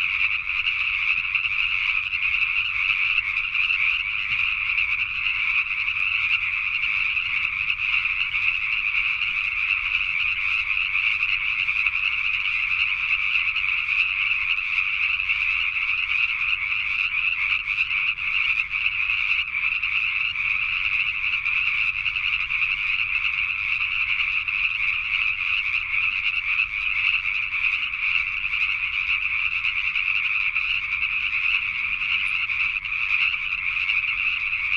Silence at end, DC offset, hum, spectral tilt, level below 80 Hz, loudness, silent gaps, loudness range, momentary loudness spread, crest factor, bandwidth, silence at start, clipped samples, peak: 0 s; under 0.1%; none; -0.5 dB/octave; -50 dBFS; -21 LUFS; none; 1 LU; 2 LU; 18 dB; 10 kHz; 0 s; under 0.1%; -6 dBFS